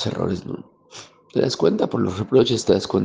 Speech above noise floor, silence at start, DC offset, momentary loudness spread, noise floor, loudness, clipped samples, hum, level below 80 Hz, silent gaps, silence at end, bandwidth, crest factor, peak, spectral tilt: 24 dB; 0 s; under 0.1%; 23 LU; -44 dBFS; -21 LUFS; under 0.1%; none; -56 dBFS; none; 0 s; 9.8 kHz; 18 dB; -4 dBFS; -6 dB/octave